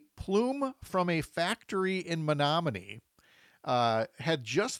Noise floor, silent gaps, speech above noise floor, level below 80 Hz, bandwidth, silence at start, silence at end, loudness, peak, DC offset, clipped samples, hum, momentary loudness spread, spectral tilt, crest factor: -63 dBFS; none; 33 dB; -60 dBFS; 15.5 kHz; 0.15 s; 0 s; -31 LUFS; -16 dBFS; under 0.1%; under 0.1%; none; 8 LU; -5 dB/octave; 16 dB